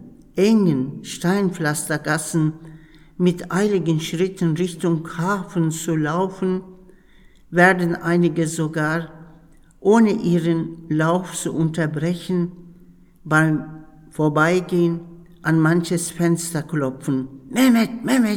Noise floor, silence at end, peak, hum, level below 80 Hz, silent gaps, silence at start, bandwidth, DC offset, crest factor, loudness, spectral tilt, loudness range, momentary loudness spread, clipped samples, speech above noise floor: -49 dBFS; 0 s; 0 dBFS; none; -54 dBFS; none; 0 s; 17.5 kHz; under 0.1%; 20 dB; -20 LUFS; -6 dB/octave; 2 LU; 9 LU; under 0.1%; 30 dB